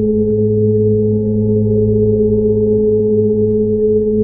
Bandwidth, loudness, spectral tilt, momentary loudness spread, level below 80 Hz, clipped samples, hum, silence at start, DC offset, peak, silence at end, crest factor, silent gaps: 1 kHz; -13 LUFS; -18 dB/octave; 1 LU; -32 dBFS; under 0.1%; none; 0 s; under 0.1%; -4 dBFS; 0 s; 8 dB; none